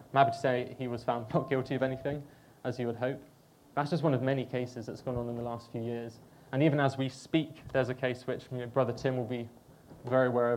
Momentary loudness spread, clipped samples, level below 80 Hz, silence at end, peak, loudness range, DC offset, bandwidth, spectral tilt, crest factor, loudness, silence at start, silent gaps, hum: 12 LU; under 0.1%; -64 dBFS; 0 s; -10 dBFS; 3 LU; under 0.1%; 16 kHz; -7.5 dB/octave; 22 dB; -33 LUFS; 0 s; none; none